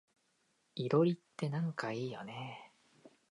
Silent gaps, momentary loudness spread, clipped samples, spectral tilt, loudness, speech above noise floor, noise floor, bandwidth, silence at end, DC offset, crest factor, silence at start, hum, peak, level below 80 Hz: none; 17 LU; under 0.1%; -7.5 dB/octave; -37 LUFS; 41 dB; -77 dBFS; 11 kHz; 0.2 s; under 0.1%; 20 dB; 0.75 s; none; -18 dBFS; -84 dBFS